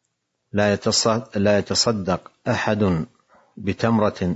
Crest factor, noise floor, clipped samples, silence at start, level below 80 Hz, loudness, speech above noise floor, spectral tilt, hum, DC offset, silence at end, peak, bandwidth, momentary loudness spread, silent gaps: 16 dB; -75 dBFS; under 0.1%; 0.55 s; -56 dBFS; -21 LUFS; 54 dB; -4.5 dB/octave; none; under 0.1%; 0 s; -4 dBFS; 8 kHz; 9 LU; none